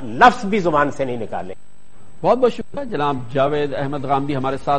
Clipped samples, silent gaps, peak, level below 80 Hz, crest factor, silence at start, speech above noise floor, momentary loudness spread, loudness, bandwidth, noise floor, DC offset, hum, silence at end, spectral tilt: under 0.1%; none; 0 dBFS; -48 dBFS; 20 dB; 0 s; 30 dB; 14 LU; -19 LUFS; 10 kHz; -48 dBFS; 4%; none; 0 s; -6 dB/octave